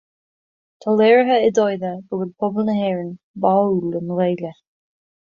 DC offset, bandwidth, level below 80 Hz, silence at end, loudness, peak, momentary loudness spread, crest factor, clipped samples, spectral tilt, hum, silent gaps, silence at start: under 0.1%; 7.2 kHz; -64 dBFS; 0.7 s; -19 LUFS; -2 dBFS; 13 LU; 16 dB; under 0.1%; -7 dB/octave; none; 3.23-3.34 s; 0.85 s